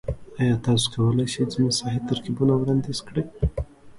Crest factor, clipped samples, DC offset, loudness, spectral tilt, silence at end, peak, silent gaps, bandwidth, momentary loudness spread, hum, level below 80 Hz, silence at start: 16 dB; under 0.1%; under 0.1%; -24 LUFS; -6 dB/octave; 0 s; -8 dBFS; none; 11.5 kHz; 7 LU; none; -38 dBFS; 0.05 s